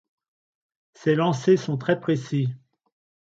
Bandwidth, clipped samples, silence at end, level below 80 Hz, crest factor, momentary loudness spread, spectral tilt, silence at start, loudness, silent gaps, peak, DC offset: 7.8 kHz; under 0.1%; 0.7 s; -68 dBFS; 18 dB; 8 LU; -7 dB/octave; 1 s; -24 LUFS; none; -8 dBFS; under 0.1%